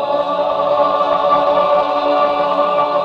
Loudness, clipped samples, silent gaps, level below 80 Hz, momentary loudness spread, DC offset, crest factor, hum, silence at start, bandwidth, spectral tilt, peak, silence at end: -15 LUFS; under 0.1%; none; -54 dBFS; 3 LU; under 0.1%; 12 dB; none; 0 s; 6.4 kHz; -6 dB/octave; -2 dBFS; 0 s